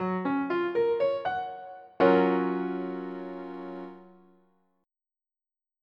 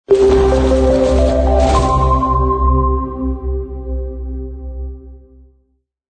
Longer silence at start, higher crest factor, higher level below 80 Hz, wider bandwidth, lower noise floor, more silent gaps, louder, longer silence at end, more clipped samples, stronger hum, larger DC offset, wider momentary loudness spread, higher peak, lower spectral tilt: about the same, 0 s vs 0.1 s; first, 20 dB vs 14 dB; second, -72 dBFS vs -18 dBFS; second, 5.8 kHz vs 9.2 kHz; first, under -90 dBFS vs -62 dBFS; neither; second, -28 LUFS vs -14 LUFS; first, 1.75 s vs 0.95 s; neither; neither; neither; about the same, 18 LU vs 16 LU; second, -10 dBFS vs -2 dBFS; first, -9 dB/octave vs -7.5 dB/octave